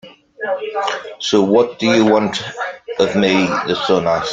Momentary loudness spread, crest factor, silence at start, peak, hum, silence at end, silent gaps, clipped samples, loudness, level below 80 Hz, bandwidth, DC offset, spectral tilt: 11 LU; 16 dB; 0.05 s; 0 dBFS; none; 0 s; none; under 0.1%; -16 LUFS; -54 dBFS; 9.2 kHz; under 0.1%; -5 dB/octave